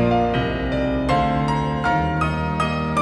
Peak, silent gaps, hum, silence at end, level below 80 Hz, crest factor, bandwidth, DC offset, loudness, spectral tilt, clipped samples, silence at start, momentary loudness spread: -8 dBFS; none; none; 0 s; -34 dBFS; 12 dB; 11 kHz; under 0.1%; -21 LUFS; -7 dB/octave; under 0.1%; 0 s; 3 LU